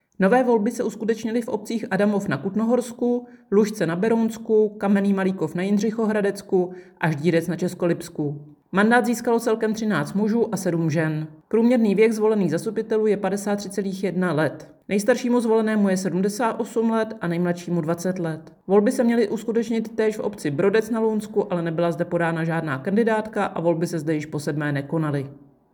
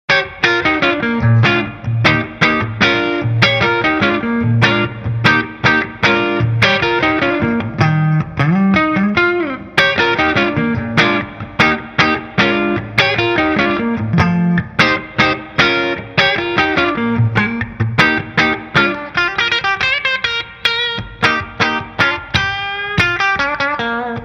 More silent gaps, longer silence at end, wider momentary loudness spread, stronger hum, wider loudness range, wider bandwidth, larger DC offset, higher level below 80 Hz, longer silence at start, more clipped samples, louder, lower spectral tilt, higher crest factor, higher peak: neither; first, 0.4 s vs 0 s; first, 7 LU vs 4 LU; neither; about the same, 2 LU vs 2 LU; first, 19.5 kHz vs 9.4 kHz; neither; second, -66 dBFS vs -40 dBFS; about the same, 0.2 s vs 0.1 s; neither; second, -23 LUFS vs -14 LUFS; about the same, -6.5 dB/octave vs -5.5 dB/octave; about the same, 16 dB vs 14 dB; second, -6 dBFS vs 0 dBFS